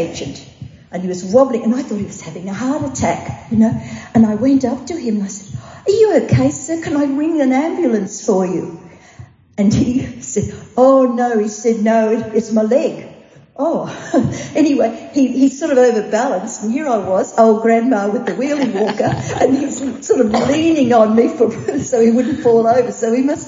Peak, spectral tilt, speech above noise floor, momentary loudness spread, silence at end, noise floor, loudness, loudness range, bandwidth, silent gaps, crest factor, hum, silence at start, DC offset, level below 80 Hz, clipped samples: 0 dBFS; -6 dB/octave; 25 dB; 11 LU; 0 s; -40 dBFS; -15 LUFS; 3 LU; 7.8 kHz; none; 16 dB; none; 0 s; under 0.1%; -48 dBFS; under 0.1%